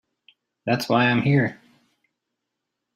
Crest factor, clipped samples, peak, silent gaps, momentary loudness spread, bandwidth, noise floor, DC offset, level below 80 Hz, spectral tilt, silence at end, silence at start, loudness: 18 dB; under 0.1%; -6 dBFS; none; 9 LU; 14.5 kHz; -82 dBFS; under 0.1%; -64 dBFS; -6.5 dB/octave; 1.4 s; 0.65 s; -21 LUFS